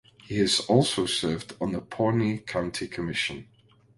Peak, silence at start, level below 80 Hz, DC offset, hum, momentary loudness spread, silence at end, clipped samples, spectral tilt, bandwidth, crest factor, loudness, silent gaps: -6 dBFS; 0.25 s; -54 dBFS; under 0.1%; none; 10 LU; 0.55 s; under 0.1%; -4.5 dB/octave; 11.5 kHz; 20 dB; -27 LUFS; none